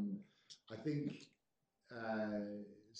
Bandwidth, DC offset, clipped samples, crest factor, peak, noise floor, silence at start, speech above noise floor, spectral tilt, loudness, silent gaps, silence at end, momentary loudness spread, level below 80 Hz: 8.6 kHz; under 0.1%; under 0.1%; 16 dB; -30 dBFS; -87 dBFS; 0 s; 44 dB; -7 dB/octave; -45 LUFS; none; 0 s; 18 LU; -84 dBFS